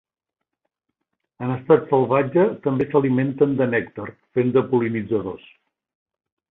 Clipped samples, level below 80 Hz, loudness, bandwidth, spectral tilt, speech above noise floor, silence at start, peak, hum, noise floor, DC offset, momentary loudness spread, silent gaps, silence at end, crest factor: under 0.1%; -60 dBFS; -20 LUFS; 4 kHz; -11.5 dB/octave; 63 dB; 1.4 s; -2 dBFS; none; -83 dBFS; under 0.1%; 12 LU; none; 1.15 s; 20 dB